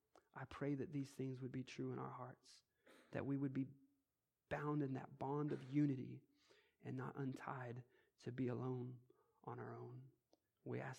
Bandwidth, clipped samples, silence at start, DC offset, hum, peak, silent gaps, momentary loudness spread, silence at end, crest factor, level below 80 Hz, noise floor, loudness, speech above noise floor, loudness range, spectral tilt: 11 kHz; under 0.1%; 0.35 s; under 0.1%; none; -28 dBFS; none; 15 LU; 0 s; 20 dB; -82 dBFS; under -90 dBFS; -48 LUFS; over 43 dB; 5 LU; -8 dB/octave